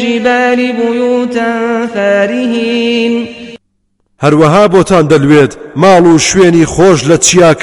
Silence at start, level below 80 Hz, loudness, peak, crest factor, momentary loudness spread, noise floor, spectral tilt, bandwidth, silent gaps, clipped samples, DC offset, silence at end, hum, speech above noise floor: 0 s; -38 dBFS; -8 LUFS; 0 dBFS; 8 dB; 8 LU; -59 dBFS; -4.5 dB/octave; 16 kHz; none; 2%; under 0.1%; 0 s; none; 52 dB